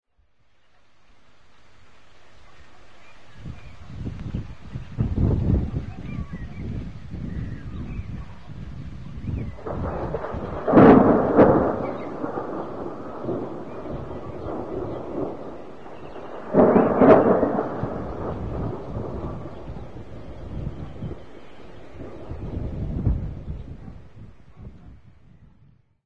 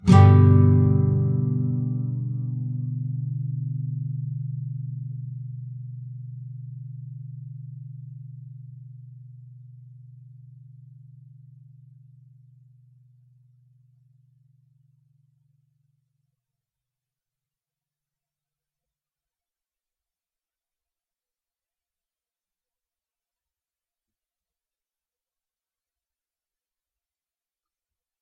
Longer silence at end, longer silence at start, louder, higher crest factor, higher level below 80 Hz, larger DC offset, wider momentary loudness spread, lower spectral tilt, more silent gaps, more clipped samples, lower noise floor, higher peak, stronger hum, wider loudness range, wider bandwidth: second, 0 s vs 18.4 s; about the same, 0 s vs 0 s; about the same, -23 LUFS vs -22 LUFS; about the same, 24 dB vs 26 dB; first, -38 dBFS vs -56 dBFS; first, 1% vs under 0.1%; about the same, 24 LU vs 26 LU; about the same, -10 dB/octave vs -9.5 dB/octave; neither; neither; second, -63 dBFS vs under -90 dBFS; about the same, 0 dBFS vs -2 dBFS; neither; second, 17 LU vs 26 LU; about the same, 7 kHz vs 6.6 kHz